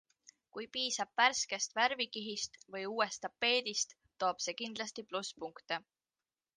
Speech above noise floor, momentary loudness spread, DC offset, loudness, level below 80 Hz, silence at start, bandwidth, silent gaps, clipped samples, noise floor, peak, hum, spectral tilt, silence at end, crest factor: over 53 dB; 12 LU; under 0.1%; -35 LUFS; -80 dBFS; 0.55 s; 10.5 kHz; none; under 0.1%; under -90 dBFS; -14 dBFS; none; -0.5 dB/octave; 0.75 s; 24 dB